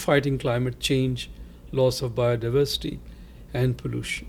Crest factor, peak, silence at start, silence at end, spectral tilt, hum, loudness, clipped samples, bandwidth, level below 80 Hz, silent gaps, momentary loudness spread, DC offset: 18 dB; -6 dBFS; 0 s; 0 s; -5.5 dB/octave; none; -25 LUFS; under 0.1%; 16.5 kHz; -42 dBFS; none; 11 LU; under 0.1%